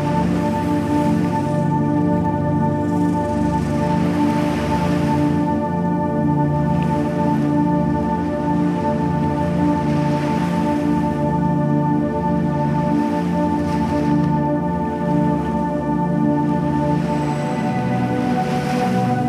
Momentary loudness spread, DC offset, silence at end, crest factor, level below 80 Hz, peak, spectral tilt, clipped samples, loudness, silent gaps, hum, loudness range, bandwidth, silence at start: 2 LU; under 0.1%; 0 s; 12 dB; -38 dBFS; -6 dBFS; -8 dB/octave; under 0.1%; -19 LUFS; none; none; 1 LU; 12.5 kHz; 0 s